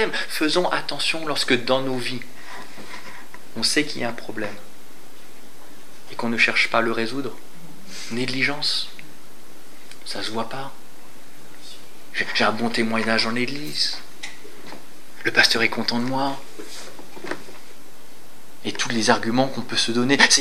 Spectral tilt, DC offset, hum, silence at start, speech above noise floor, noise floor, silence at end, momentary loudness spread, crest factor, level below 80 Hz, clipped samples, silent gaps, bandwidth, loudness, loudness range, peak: -2.5 dB/octave; 5%; none; 0 s; 25 dB; -48 dBFS; 0 s; 22 LU; 24 dB; -68 dBFS; under 0.1%; none; 16 kHz; -22 LUFS; 6 LU; 0 dBFS